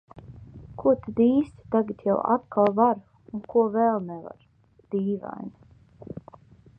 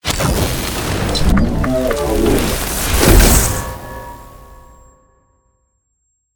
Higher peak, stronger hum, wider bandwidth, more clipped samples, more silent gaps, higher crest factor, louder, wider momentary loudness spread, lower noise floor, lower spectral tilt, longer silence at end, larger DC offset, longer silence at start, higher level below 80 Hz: second, -8 dBFS vs 0 dBFS; neither; second, 3.9 kHz vs over 20 kHz; neither; neither; about the same, 18 dB vs 16 dB; second, -24 LUFS vs -15 LUFS; about the same, 21 LU vs 19 LU; second, -51 dBFS vs -66 dBFS; first, -10.5 dB/octave vs -4 dB/octave; second, 0.65 s vs 1.8 s; neither; about the same, 0.15 s vs 0.05 s; second, -58 dBFS vs -20 dBFS